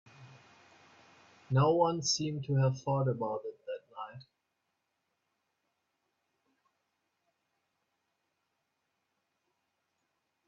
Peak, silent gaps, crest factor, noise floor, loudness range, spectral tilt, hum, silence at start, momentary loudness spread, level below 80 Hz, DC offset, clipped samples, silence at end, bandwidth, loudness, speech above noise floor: -14 dBFS; none; 22 dB; -83 dBFS; 19 LU; -5.5 dB/octave; none; 0.2 s; 17 LU; -74 dBFS; under 0.1%; under 0.1%; 6.25 s; 7.6 kHz; -31 LUFS; 53 dB